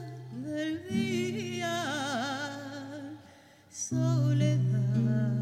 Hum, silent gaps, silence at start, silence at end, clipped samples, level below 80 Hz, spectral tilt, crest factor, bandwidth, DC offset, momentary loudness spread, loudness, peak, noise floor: none; none; 0 s; 0 s; under 0.1%; -72 dBFS; -6 dB/octave; 14 dB; 12.5 kHz; under 0.1%; 15 LU; -31 LUFS; -16 dBFS; -56 dBFS